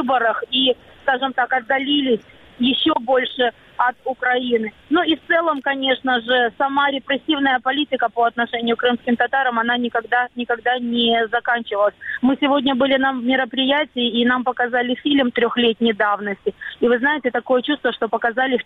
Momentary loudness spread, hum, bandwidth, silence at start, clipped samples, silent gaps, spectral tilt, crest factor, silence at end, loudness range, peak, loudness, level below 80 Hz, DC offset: 4 LU; none; 4.4 kHz; 0 s; under 0.1%; none; -6 dB/octave; 16 dB; 0.05 s; 1 LU; -4 dBFS; -19 LUFS; -58 dBFS; under 0.1%